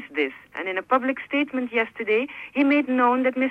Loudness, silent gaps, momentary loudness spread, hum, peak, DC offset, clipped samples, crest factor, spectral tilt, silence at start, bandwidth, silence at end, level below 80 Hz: -23 LUFS; none; 9 LU; none; -8 dBFS; under 0.1%; under 0.1%; 14 dB; -6 dB/octave; 0 s; 5.2 kHz; 0 s; -70 dBFS